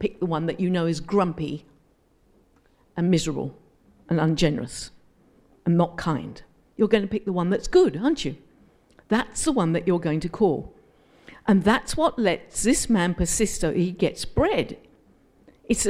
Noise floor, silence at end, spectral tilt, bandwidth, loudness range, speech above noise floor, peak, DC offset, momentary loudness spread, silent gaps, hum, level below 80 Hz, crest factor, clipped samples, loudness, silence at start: -62 dBFS; 0 s; -5 dB/octave; 15.5 kHz; 4 LU; 39 dB; -4 dBFS; under 0.1%; 12 LU; none; none; -42 dBFS; 20 dB; under 0.1%; -24 LUFS; 0 s